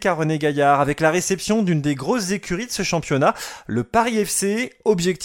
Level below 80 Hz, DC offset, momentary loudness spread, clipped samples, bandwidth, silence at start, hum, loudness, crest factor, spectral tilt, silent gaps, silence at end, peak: -50 dBFS; under 0.1%; 7 LU; under 0.1%; 17 kHz; 0 s; none; -20 LUFS; 16 dB; -4.5 dB/octave; none; 0 s; -4 dBFS